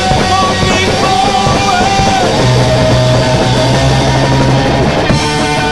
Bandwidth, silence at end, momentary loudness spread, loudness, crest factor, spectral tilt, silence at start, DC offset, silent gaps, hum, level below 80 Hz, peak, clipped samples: 12.5 kHz; 0 s; 2 LU; -10 LUFS; 10 dB; -5 dB/octave; 0 s; 2%; none; none; -24 dBFS; 0 dBFS; under 0.1%